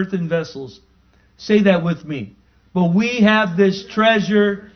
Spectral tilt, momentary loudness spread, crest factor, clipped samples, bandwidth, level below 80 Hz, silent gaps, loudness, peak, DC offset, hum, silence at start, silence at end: -6.5 dB/octave; 17 LU; 18 dB; under 0.1%; 6.6 kHz; -54 dBFS; none; -17 LUFS; 0 dBFS; under 0.1%; none; 0 s; 0.1 s